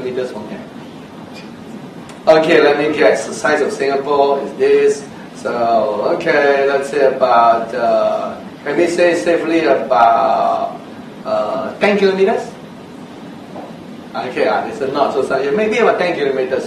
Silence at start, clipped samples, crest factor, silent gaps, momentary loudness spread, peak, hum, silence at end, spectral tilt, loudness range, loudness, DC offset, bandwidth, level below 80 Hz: 0 s; under 0.1%; 16 dB; none; 21 LU; 0 dBFS; none; 0 s; -5 dB/octave; 5 LU; -15 LUFS; under 0.1%; 12.5 kHz; -58 dBFS